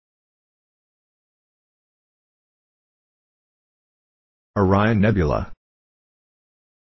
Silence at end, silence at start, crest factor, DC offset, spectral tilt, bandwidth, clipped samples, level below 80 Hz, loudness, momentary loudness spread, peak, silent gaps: 1.35 s; 4.55 s; 22 dB; under 0.1%; -9 dB/octave; 6 kHz; under 0.1%; -40 dBFS; -20 LUFS; 12 LU; -4 dBFS; none